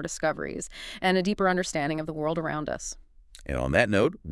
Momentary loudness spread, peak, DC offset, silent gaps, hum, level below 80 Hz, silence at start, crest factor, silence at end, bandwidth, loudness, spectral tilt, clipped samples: 13 LU; -6 dBFS; under 0.1%; none; none; -46 dBFS; 0 s; 22 dB; 0 s; 12 kHz; -27 LUFS; -5 dB/octave; under 0.1%